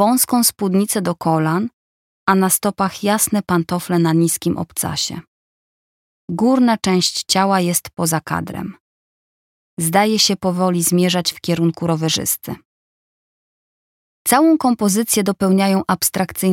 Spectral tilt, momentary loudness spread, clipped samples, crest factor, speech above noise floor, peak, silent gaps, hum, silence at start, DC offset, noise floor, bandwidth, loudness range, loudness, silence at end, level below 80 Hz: -4 dB/octave; 9 LU; under 0.1%; 16 dB; over 73 dB; -2 dBFS; 1.73-2.26 s, 5.28-6.28 s, 8.80-9.77 s, 12.65-14.25 s; none; 0 s; under 0.1%; under -90 dBFS; 17 kHz; 3 LU; -17 LUFS; 0 s; -54 dBFS